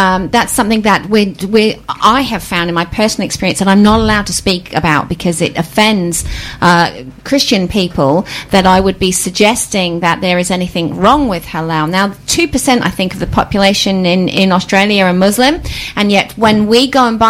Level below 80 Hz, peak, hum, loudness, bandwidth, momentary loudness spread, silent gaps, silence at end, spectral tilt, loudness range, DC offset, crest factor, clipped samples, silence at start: -32 dBFS; 0 dBFS; none; -11 LUFS; 16 kHz; 6 LU; none; 0 s; -4 dB/octave; 2 LU; under 0.1%; 12 dB; under 0.1%; 0 s